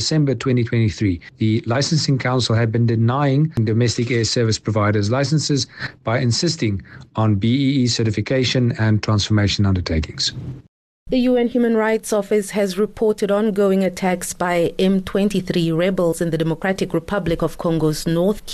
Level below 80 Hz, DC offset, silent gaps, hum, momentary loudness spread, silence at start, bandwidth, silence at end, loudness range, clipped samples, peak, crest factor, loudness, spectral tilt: -42 dBFS; under 0.1%; 10.68-11.06 s; none; 5 LU; 0 s; 13 kHz; 0 s; 2 LU; under 0.1%; -8 dBFS; 10 dB; -19 LUFS; -5.5 dB/octave